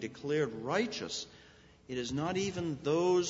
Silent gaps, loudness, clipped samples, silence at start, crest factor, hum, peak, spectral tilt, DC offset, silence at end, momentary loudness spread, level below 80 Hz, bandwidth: none; -34 LUFS; under 0.1%; 0 s; 16 dB; none; -18 dBFS; -5 dB/octave; under 0.1%; 0 s; 8 LU; -64 dBFS; 8 kHz